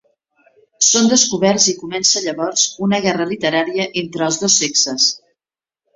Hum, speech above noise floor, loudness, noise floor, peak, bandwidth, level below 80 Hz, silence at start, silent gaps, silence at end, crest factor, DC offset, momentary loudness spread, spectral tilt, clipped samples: none; over 73 dB; -15 LUFS; under -90 dBFS; 0 dBFS; 8 kHz; -60 dBFS; 0.8 s; none; 0.8 s; 18 dB; under 0.1%; 8 LU; -2 dB/octave; under 0.1%